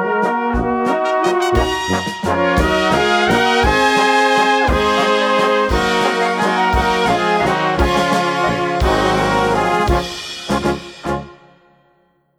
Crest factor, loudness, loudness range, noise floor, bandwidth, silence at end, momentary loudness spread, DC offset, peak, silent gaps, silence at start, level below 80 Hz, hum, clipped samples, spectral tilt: 16 dB; -15 LUFS; 4 LU; -58 dBFS; 19 kHz; 1.05 s; 6 LU; under 0.1%; 0 dBFS; none; 0 s; -28 dBFS; none; under 0.1%; -4.5 dB/octave